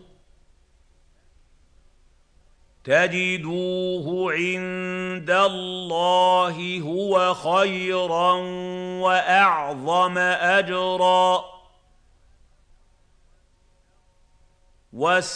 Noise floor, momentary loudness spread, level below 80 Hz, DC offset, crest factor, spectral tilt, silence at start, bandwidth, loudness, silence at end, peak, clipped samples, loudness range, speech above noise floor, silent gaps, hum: -60 dBFS; 10 LU; -60 dBFS; under 0.1%; 18 dB; -4 dB/octave; 2.85 s; 10 kHz; -21 LUFS; 0 s; -6 dBFS; under 0.1%; 7 LU; 38 dB; none; none